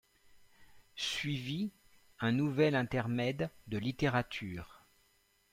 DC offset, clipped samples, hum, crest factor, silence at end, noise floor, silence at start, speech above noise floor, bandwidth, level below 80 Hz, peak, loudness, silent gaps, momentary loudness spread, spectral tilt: under 0.1%; under 0.1%; none; 20 dB; 0.75 s; -72 dBFS; 0.35 s; 38 dB; 16 kHz; -62 dBFS; -18 dBFS; -35 LUFS; none; 12 LU; -6 dB/octave